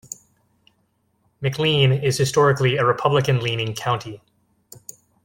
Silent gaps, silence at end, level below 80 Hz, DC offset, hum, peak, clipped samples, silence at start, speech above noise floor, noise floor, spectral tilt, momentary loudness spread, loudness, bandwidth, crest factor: none; 1.05 s; -56 dBFS; under 0.1%; none; -4 dBFS; under 0.1%; 1.4 s; 47 dB; -67 dBFS; -5 dB/octave; 21 LU; -20 LUFS; 17 kHz; 18 dB